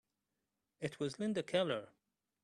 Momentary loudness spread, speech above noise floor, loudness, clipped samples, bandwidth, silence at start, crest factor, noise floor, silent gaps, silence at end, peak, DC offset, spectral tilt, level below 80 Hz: 9 LU; 50 dB; -39 LUFS; under 0.1%; 12 kHz; 0.8 s; 22 dB; -88 dBFS; none; 0.6 s; -20 dBFS; under 0.1%; -5.5 dB/octave; -80 dBFS